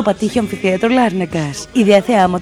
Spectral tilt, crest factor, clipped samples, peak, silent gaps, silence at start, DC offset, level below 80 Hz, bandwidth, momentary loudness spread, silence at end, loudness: -5.5 dB/octave; 14 dB; under 0.1%; 0 dBFS; none; 0 s; under 0.1%; -44 dBFS; 15 kHz; 8 LU; 0 s; -15 LUFS